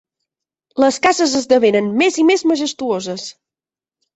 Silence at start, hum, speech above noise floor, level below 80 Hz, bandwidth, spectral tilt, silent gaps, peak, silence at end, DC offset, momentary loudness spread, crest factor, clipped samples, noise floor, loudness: 0.75 s; none; over 75 dB; -60 dBFS; 8.2 kHz; -3.5 dB/octave; none; 0 dBFS; 0.85 s; under 0.1%; 13 LU; 16 dB; under 0.1%; under -90 dBFS; -15 LUFS